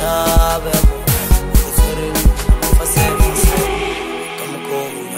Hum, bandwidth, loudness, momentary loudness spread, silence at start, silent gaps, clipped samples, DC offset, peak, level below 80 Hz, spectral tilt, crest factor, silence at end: none; 16.5 kHz; -16 LUFS; 9 LU; 0 s; none; under 0.1%; 0.8%; 0 dBFS; -16 dBFS; -4.5 dB/octave; 14 dB; 0 s